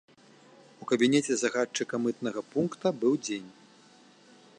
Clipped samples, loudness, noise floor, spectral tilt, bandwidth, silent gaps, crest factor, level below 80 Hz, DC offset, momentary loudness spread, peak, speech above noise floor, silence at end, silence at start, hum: under 0.1%; -29 LUFS; -57 dBFS; -4 dB/octave; 10.5 kHz; none; 18 dB; -78 dBFS; under 0.1%; 11 LU; -12 dBFS; 29 dB; 1.1 s; 0.8 s; none